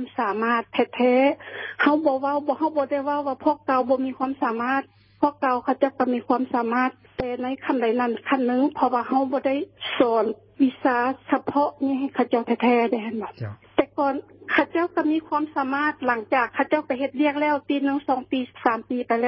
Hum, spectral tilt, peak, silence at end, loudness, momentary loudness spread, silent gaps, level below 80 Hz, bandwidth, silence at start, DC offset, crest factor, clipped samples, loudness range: none; -9.5 dB/octave; -2 dBFS; 0 s; -23 LUFS; 6 LU; none; -62 dBFS; 5.8 kHz; 0 s; under 0.1%; 20 dB; under 0.1%; 2 LU